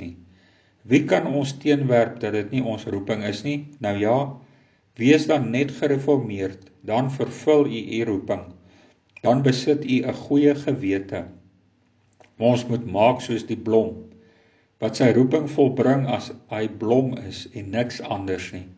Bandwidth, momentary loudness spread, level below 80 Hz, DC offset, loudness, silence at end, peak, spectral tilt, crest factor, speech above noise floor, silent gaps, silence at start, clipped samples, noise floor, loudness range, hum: 8 kHz; 11 LU; -56 dBFS; under 0.1%; -22 LUFS; 0.05 s; -4 dBFS; -7 dB/octave; 20 dB; 40 dB; none; 0 s; under 0.1%; -62 dBFS; 2 LU; none